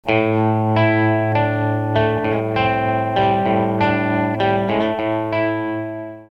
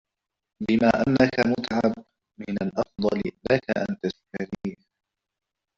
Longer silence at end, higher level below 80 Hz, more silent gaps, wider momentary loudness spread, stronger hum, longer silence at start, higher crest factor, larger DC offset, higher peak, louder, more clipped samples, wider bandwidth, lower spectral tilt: second, 0.05 s vs 1.05 s; first, -48 dBFS vs -54 dBFS; neither; second, 4 LU vs 14 LU; neither; second, 0.05 s vs 0.6 s; second, 16 dB vs 22 dB; first, 0.2% vs under 0.1%; about the same, -2 dBFS vs -4 dBFS; first, -18 LUFS vs -25 LUFS; neither; second, 5.8 kHz vs 7.6 kHz; first, -8.5 dB/octave vs -7 dB/octave